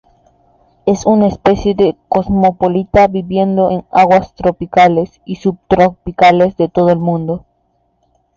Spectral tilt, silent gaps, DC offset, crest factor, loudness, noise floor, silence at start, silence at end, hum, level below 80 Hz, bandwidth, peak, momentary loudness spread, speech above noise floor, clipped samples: -7 dB/octave; none; under 0.1%; 12 dB; -13 LUFS; -60 dBFS; 0.85 s; 1 s; none; -38 dBFS; 7.4 kHz; 0 dBFS; 9 LU; 49 dB; under 0.1%